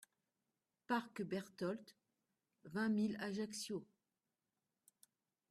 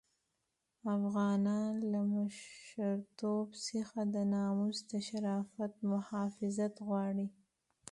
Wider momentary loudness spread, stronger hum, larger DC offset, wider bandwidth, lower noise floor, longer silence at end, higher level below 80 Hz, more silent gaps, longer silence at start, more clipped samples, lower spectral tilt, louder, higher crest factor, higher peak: about the same, 9 LU vs 7 LU; neither; neither; first, 14 kHz vs 11.5 kHz; first, under -90 dBFS vs -85 dBFS; first, 1.65 s vs 0.6 s; second, -86 dBFS vs -80 dBFS; neither; about the same, 0.9 s vs 0.85 s; neither; second, -5 dB/octave vs -6.5 dB/octave; second, -43 LUFS vs -37 LUFS; first, 20 dB vs 12 dB; about the same, -26 dBFS vs -26 dBFS